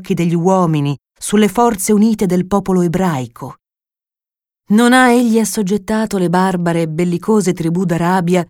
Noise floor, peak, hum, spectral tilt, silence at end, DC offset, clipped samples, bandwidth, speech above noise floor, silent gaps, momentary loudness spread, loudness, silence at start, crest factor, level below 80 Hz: under -90 dBFS; 0 dBFS; none; -6 dB/octave; 0.05 s; under 0.1%; under 0.1%; 17 kHz; over 76 dB; none; 8 LU; -14 LUFS; 0 s; 14 dB; -46 dBFS